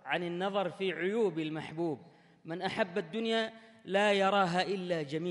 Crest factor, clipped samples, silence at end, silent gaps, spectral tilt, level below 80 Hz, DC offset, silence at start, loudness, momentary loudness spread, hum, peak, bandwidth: 18 dB; under 0.1%; 0 s; none; -5.5 dB/octave; -78 dBFS; under 0.1%; 0.05 s; -32 LUFS; 10 LU; none; -16 dBFS; 11.5 kHz